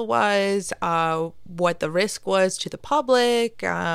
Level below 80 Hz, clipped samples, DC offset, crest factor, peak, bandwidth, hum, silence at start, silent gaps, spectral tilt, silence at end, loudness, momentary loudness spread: -58 dBFS; under 0.1%; under 0.1%; 16 dB; -8 dBFS; 15 kHz; none; 0 s; none; -4 dB/octave; 0 s; -22 LUFS; 6 LU